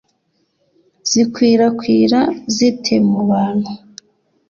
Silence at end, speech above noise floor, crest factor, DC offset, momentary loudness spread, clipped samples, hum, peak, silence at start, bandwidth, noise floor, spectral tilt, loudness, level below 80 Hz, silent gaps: 0.75 s; 51 dB; 14 dB; under 0.1%; 9 LU; under 0.1%; none; -2 dBFS; 1.05 s; 7.4 kHz; -65 dBFS; -5 dB/octave; -15 LUFS; -56 dBFS; none